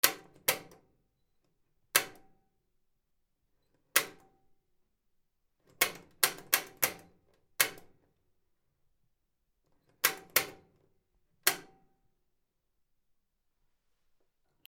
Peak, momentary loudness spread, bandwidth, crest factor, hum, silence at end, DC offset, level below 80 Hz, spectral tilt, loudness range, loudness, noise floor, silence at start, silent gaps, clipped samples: -6 dBFS; 14 LU; 19.5 kHz; 34 dB; none; 3.05 s; under 0.1%; -76 dBFS; 0.5 dB/octave; 7 LU; -31 LUFS; -79 dBFS; 0.05 s; none; under 0.1%